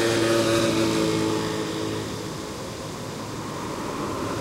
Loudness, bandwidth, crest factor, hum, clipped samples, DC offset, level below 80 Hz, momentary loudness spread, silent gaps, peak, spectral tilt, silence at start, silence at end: -26 LUFS; 16 kHz; 18 dB; none; under 0.1%; under 0.1%; -50 dBFS; 12 LU; none; -8 dBFS; -4.5 dB/octave; 0 s; 0 s